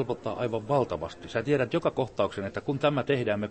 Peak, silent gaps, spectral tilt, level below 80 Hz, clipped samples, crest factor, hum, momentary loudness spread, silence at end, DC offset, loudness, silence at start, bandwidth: -10 dBFS; none; -7 dB/octave; -58 dBFS; under 0.1%; 18 dB; none; 6 LU; 0 s; under 0.1%; -29 LUFS; 0 s; 8.8 kHz